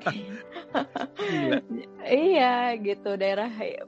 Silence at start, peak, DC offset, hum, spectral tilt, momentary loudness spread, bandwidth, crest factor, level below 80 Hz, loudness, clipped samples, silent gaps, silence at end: 0 s; -8 dBFS; under 0.1%; none; -6 dB/octave; 15 LU; 7.8 kHz; 18 dB; -72 dBFS; -26 LUFS; under 0.1%; none; 0 s